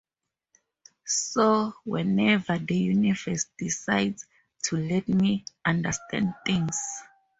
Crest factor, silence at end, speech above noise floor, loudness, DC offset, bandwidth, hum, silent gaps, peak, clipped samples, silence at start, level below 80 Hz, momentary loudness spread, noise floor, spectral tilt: 20 dB; 0.35 s; 61 dB; -26 LUFS; under 0.1%; 8 kHz; none; none; -8 dBFS; under 0.1%; 1.05 s; -60 dBFS; 8 LU; -87 dBFS; -4.5 dB/octave